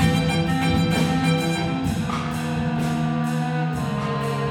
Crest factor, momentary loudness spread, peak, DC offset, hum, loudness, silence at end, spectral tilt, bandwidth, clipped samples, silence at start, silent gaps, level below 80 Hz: 16 dB; 5 LU; -6 dBFS; under 0.1%; none; -23 LUFS; 0 s; -6 dB/octave; 16 kHz; under 0.1%; 0 s; none; -40 dBFS